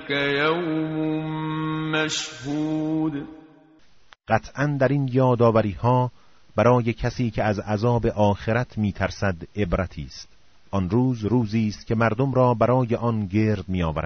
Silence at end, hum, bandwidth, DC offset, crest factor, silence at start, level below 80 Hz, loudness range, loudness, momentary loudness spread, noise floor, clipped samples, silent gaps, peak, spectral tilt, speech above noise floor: 0 s; none; 7.4 kHz; 0.3%; 18 dB; 0 s; -44 dBFS; 5 LU; -23 LUFS; 9 LU; -54 dBFS; under 0.1%; none; -6 dBFS; -6 dB/octave; 31 dB